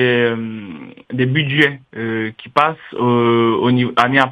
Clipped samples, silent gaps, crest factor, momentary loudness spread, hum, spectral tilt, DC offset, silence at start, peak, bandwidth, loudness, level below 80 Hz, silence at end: under 0.1%; none; 16 dB; 14 LU; none; -7 dB/octave; under 0.1%; 0 s; 0 dBFS; 10 kHz; -16 LUFS; -60 dBFS; 0 s